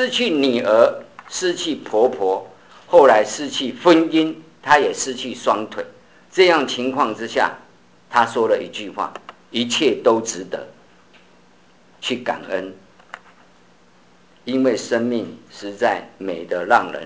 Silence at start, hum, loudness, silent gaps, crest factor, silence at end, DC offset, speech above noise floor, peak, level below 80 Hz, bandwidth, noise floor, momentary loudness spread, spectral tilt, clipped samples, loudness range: 0 s; none; -19 LUFS; none; 20 dB; 0 s; 0.2%; 35 dB; 0 dBFS; -64 dBFS; 8 kHz; -53 dBFS; 16 LU; -3.5 dB/octave; under 0.1%; 12 LU